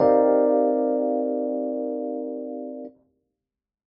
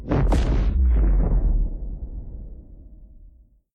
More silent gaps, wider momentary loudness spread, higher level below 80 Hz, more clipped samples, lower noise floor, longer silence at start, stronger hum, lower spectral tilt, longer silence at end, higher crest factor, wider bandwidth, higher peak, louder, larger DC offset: neither; second, 16 LU vs 19 LU; second, -66 dBFS vs -22 dBFS; neither; first, -88 dBFS vs -51 dBFS; about the same, 0 s vs 0 s; neither; about the same, -8 dB/octave vs -8.5 dB/octave; first, 0.95 s vs 0.5 s; about the same, 16 dB vs 14 dB; second, 5.2 kHz vs 6.8 kHz; about the same, -8 dBFS vs -8 dBFS; about the same, -23 LUFS vs -23 LUFS; neither